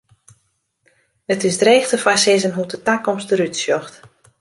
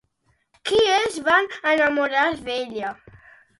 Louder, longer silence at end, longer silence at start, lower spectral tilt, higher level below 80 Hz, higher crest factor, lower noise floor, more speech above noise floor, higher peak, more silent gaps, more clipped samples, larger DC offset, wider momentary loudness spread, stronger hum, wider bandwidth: first, -17 LUFS vs -21 LUFS; second, 0.5 s vs 0.65 s; first, 1.3 s vs 0.65 s; about the same, -3 dB/octave vs -2.5 dB/octave; second, -64 dBFS vs -58 dBFS; about the same, 18 dB vs 18 dB; about the same, -67 dBFS vs -67 dBFS; first, 50 dB vs 46 dB; about the same, -2 dBFS vs -4 dBFS; neither; neither; neither; about the same, 10 LU vs 12 LU; neither; about the same, 11.5 kHz vs 11.5 kHz